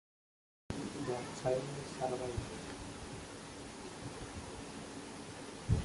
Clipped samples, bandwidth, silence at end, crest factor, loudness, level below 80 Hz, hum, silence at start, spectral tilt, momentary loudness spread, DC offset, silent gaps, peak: under 0.1%; 11.5 kHz; 0 s; 22 dB; -43 LUFS; -52 dBFS; none; 0.7 s; -5.5 dB/octave; 10 LU; under 0.1%; none; -20 dBFS